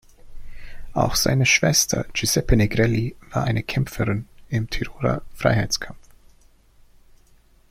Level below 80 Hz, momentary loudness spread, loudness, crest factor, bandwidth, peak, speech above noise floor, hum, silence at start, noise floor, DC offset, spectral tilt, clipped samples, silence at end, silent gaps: -36 dBFS; 11 LU; -21 LUFS; 20 dB; 16.5 kHz; -4 dBFS; 33 dB; none; 0.25 s; -54 dBFS; under 0.1%; -4 dB/octave; under 0.1%; 1.75 s; none